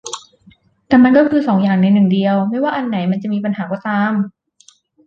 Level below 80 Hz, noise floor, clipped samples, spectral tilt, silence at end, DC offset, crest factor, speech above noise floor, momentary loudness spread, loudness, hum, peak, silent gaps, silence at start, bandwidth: -56 dBFS; -51 dBFS; under 0.1%; -7 dB/octave; 0.75 s; under 0.1%; 14 dB; 37 dB; 11 LU; -15 LUFS; none; -2 dBFS; none; 0.05 s; 9 kHz